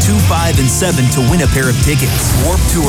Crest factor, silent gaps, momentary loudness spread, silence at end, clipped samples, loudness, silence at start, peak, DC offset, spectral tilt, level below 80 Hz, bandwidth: 10 dB; none; 1 LU; 0 s; under 0.1%; -12 LUFS; 0 s; 0 dBFS; under 0.1%; -4.5 dB/octave; -20 dBFS; over 20 kHz